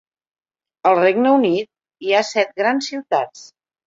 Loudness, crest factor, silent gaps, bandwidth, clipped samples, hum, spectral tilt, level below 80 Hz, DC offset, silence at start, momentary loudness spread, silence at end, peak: -18 LUFS; 18 dB; none; 7.8 kHz; under 0.1%; none; -4.5 dB/octave; -68 dBFS; under 0.1%; 0.85 s; 10 LU; 0.45 s; -2 dBFS